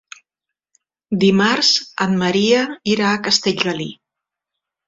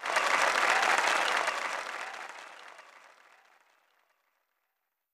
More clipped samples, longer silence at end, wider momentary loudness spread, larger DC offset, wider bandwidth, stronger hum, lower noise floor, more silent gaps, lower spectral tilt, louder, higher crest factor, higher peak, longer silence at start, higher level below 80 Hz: neither; second, 0.95 s vs 2.15 s; second, 7 LU vs 20 LU; neither; second, 7.8 kHz vs 15.5 kHz; neither; about the same, -84 dBFS vs -83 dBFS; neither; first, -4 dB/octave vs 0.5 dB/octave; first, -16 LUFS vs -27 LUFS; second, 16 dB vs 22 dB; first, -2 dBFS vs -12 dBFS; first, 1.1 s vs 0 s; first, -58 dBFS vs -80 dBFS